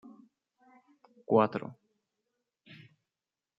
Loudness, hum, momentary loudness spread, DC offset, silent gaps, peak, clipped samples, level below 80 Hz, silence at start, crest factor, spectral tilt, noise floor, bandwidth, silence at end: -29 LUFS; none; 27 LU; under 0.1%; none; -10 dBFS; under 0.1%; -80 dBFS; 0.05 s; 26 dB; -9.5 dB/octave; under -90 dBFS; 5.6 kHz; 1.85 s